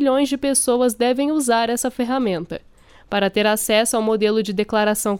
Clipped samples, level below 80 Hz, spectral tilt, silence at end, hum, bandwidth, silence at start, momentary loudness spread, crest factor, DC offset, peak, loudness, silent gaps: under 0.1%; -52 dBFS; -3.5 dB/octave; 0 s; none; 19 kHz; 0 s; 6 LU; 14 dB; under 0.1%; -6 dBFS; -19 LUFS; none